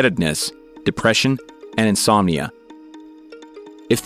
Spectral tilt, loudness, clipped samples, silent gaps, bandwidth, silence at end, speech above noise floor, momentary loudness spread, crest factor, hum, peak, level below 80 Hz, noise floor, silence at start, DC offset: -4 dB/octave; -19 LUFS; under 0.1%; none; 16 kHz; 0 s; 23 dB; 23 LU; 20 dB; none; -2 dBFS; -48 dBFS; -41 dBFS; 0 s; under 0.1%